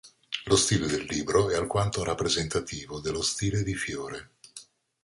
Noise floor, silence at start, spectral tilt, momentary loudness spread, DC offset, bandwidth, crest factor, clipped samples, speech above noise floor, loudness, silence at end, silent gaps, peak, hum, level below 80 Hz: -51 dBFS; 0.05 s; -4 dB/octave; 17 LU; under 0.1%; 11.5 kHz; 20 dB; under 0.1%; 24 dB; -27 LUFS; 0.4 s; none; -8 dBFS; none; -48 dBFS